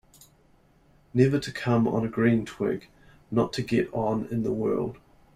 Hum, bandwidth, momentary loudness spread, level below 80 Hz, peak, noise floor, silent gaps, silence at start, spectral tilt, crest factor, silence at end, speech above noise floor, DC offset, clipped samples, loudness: none; 14 kHz; 7 LU; -56 dBFS; -6 dBFS; -60 dBFS; none; 1.15 s; -7.5 dB/octave; 20 dB; 0.4 s; 35 dB; under 0.1%; under 0.1%; -27 LUFS